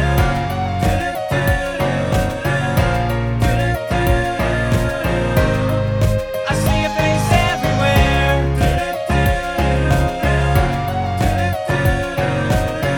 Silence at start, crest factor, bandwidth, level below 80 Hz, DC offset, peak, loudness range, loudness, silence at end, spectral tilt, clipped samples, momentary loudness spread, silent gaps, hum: 0 s; 16 dB; 19 kHz; -24 dBFS; under 0.1%; -2 dBFS; 2 LU; -17 LUFS; 0 s; -6 dB/octave; under 0.1%; 4 LU; none; none